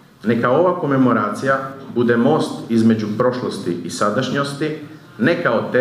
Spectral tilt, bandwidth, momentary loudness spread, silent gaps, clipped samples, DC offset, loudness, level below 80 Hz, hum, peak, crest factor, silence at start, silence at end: -6.5 dB/octave; 13 kHz; 9 LU; none; under 0.1%; under 0.1%; -18 LUFS; -62 dBFS; none; -2 dBFS; 16 dB; 0.25 s; 0 s